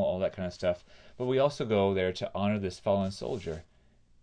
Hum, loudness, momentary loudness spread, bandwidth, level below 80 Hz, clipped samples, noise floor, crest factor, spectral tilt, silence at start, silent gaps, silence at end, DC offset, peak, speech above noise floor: none; -31 LUFS; 10 LU; 10.5 kHz; -58 dBFS; under 0.1%; -62 dBFS; 18 dB; -6.5 dB/octave; 0 s; none; 0.6 s; under 0.1%; -12 dBFS; 32 dB